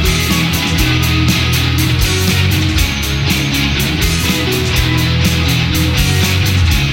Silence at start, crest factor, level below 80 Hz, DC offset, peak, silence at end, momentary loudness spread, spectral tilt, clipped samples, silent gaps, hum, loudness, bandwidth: 0 s; 12 dB; -20 dBFS; under 0.1%; 0 dBFS; 0 s; 2 LU; -4 dB/octave; under 0.1%; none; none; -13 LUFS; 17 kHz